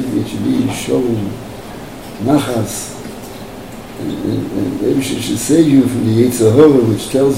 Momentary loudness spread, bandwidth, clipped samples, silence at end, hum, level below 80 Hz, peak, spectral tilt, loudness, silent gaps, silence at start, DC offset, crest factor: 20 LU; 16.5 kHz; 0.1%; 0 s; none; -42 dBFS; 0 dBFS; -6 dB/octave; -14 LUFS; none; 0 s; 0.7%; 14 dB